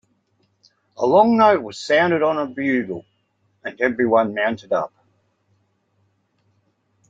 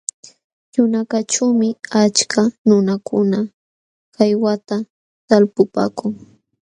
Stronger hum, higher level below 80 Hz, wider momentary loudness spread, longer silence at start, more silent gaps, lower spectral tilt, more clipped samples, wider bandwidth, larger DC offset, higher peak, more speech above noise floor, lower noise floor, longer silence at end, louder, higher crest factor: neither; about the same, -66 dBFS vs -64 dBFS; first, 17 LU vs 11 LU; first, 1 s vs 0.75 s; second, none vs 2.58-2.65 s, 3.54-4.12 s, 4.90-5.28 s; first, -6 dB/octave vs -4.5 dB/octave; neither; second, 7.8 kHz vs 10.5 kHz; neither; about the same, -2 dBFS vs 0 dBFS; second, 48 dB vs over 74 dB; second, -67 dBFS vs under -90 dBFS; first, 2.2 s vs 0.6 s; about the same, -19 LUFS vs -17 LUFS; about the same, 20 dB vs 18 dB